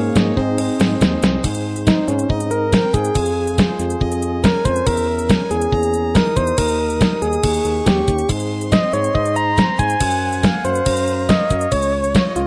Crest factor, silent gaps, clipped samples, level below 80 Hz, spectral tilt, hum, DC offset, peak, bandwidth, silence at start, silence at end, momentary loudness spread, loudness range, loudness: 16 dB; none; under 0.1%; -30 dBFS; -6 dB/octave; none; under 0.1%; -2 dBFS; 11 kHz; 0 s; 0 s; 3 LU; 1 LU; -18 LUFS